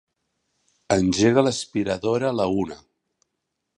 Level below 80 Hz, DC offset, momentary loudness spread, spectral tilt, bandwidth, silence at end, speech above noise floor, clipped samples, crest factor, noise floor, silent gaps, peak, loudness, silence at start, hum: -50 dBFS; under 0.1%; 9 LU; -5 dB/octave; 11 kHz; 1 s; 58 dB; under 0.1%; 20 dB; -79 dBFS; none; -4 dBFS; -22 LUFS; 0.9 s; none